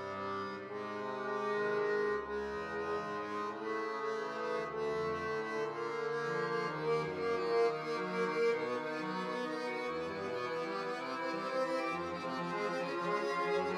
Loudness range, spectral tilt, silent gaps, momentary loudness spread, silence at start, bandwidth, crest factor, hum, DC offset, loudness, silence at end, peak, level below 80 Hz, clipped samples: 3 LU; -5.5 dB/octave; none; 6 LU; 0 s; 11 kHz; 14 dB; none; under 0.1%; -37 LUFS; 0 s; -22 dBFS; -72 dBFS; under 0.1%